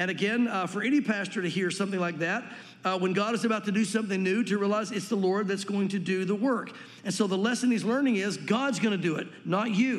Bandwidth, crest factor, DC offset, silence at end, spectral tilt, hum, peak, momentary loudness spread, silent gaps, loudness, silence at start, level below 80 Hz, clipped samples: 12.5 kHz; 16 dB; under 0.1%; 0 s; -5 dB/octave; none; -12 dBFS; 5 LU; none; -28 LUFS; 0 s; -84 dBFS; under 0.1%